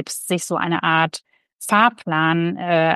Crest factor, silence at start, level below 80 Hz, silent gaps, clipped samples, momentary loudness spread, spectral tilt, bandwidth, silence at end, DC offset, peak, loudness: 18 dB; 0 s; -70 dBFS; 1.53-1.57 s; under 0.1%; 7 LU; -4.5 dB/octave; 13 kHz; 0 s; under 0.1%; -2 dBFS; -19 LUFS